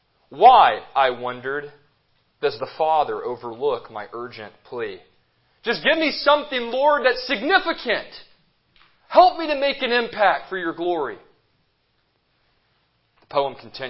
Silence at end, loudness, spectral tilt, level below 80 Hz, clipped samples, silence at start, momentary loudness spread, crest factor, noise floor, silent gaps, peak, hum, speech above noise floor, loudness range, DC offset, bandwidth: 0 s; -20 LUFS; -7.5 dB/octave; -60 dBFS; under 0.1%; 0.3 s; 16 LU; 20 dB; -68 dBFS; none; -2 dBFS; none; 47 dB; 6 LU; under 0.1%; 5.8 kHz